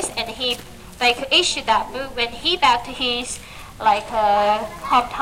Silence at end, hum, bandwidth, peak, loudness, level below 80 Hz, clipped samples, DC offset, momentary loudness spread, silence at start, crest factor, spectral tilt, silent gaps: 0 s; none; 16.5 kHz; -2 dBFS; -19 LUFS; -44 dBFS; under 0.1%; under 0.1%; 10 LU; 0 s; 20 dB; -1.5 dB/octave; none